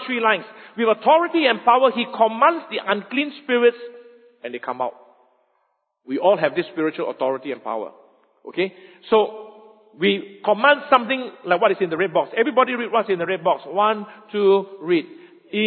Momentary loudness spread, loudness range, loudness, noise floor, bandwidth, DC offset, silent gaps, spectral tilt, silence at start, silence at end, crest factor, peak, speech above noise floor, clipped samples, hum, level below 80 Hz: 13 LU; 6 LU; -20 LUFS; -70 dBFS; 4.5 kHz; under 0.1%; none; -8.5 dB/octave; 0 s; 0 s; 20 dB; 0 dBFS; 50 dB; under 0.1%; none; -74 dBFS